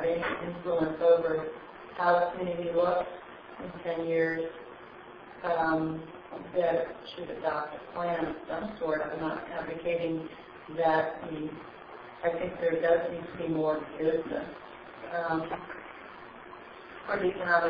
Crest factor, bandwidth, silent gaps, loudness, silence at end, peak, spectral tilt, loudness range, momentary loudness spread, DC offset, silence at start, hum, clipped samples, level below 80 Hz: 20 dB; 5.2 kHz; none; -31 LUFS; 0 s; -10 dBFS; -4.5 dB/octave; 5 LU; 20 LU; under 0.1%; 0 s; none; under 0.1%; -62 dBFS